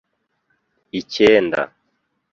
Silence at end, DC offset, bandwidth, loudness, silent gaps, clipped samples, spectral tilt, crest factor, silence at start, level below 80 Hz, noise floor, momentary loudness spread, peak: 0.7 s; under 0.1%; 7.4 kHz; -17 LUFS; none; under 0.1%; -5 dB/octave; 20 dB; 0.95 s; -56 dBFS; -70 dBFS; 16 LU; -2 dBFS